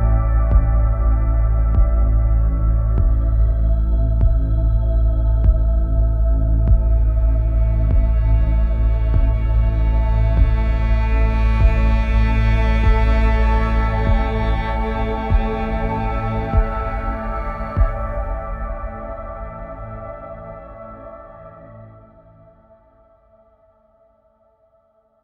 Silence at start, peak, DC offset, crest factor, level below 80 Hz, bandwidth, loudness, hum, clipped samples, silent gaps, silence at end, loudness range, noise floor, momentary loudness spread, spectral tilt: 0 s; -2 dBFS; under 0.1%; 14 dB; -18 dBFS; 4.7 kHz; -19 LUFS; none; under 0.1%; none; 3.35 s; 14 LU; -59 dBFS; 15 LU; -9 dB/octave